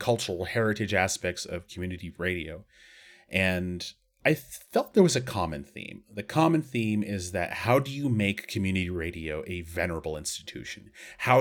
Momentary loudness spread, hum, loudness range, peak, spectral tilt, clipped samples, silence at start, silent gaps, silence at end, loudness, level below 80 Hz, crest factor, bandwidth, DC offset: 15 LU; none; 4 LU; -6 dBFS; -5 dB/octave; under 0.1%; 0 s; none; 0 s; -29 LUFS; -52 dBFS; 24 dB; 19.5 kHz; under 0.1%